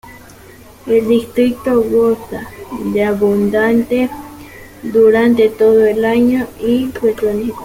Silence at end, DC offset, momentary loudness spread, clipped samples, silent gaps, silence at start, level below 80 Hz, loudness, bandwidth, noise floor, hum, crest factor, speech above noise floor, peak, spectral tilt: 0 s; under 0.1%; 17 LU; under 0.1%; none; 0.05 s; -44 dBFS; -14 LUFS; 16.5 kHz; -39 dBFS; none; 12 dB; 26 dB; -2 dBFS; -6.5 dB/octave